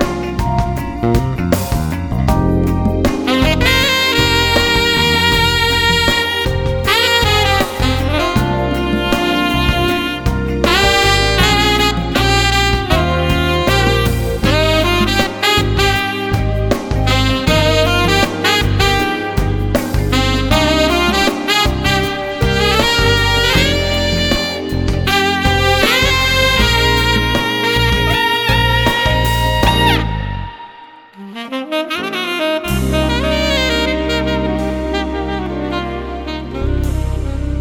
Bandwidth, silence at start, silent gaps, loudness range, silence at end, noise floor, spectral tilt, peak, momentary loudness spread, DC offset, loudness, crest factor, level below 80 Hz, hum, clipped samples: over 20 kHz; 0 s; none; 5 LU; 0 s; -38 dBFS; -4.5 dB/octave; 0 dBFS; 8 LU; under 0.1%; -14 LUFS; 14 dB; -22 dBFS; none; under 0.1%